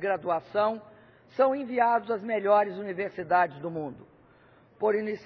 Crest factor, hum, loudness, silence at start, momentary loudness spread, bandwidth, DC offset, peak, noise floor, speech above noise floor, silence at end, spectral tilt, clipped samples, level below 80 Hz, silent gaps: 18 dB; none; -27 LUFS; 0 s; 11 LU; 5.4 kHz; under 0.1%; -10 dBFS; -58 dBFS; 31 dB; 0 s; -8 dB/octave; under 0.1%; -72 dBFS; none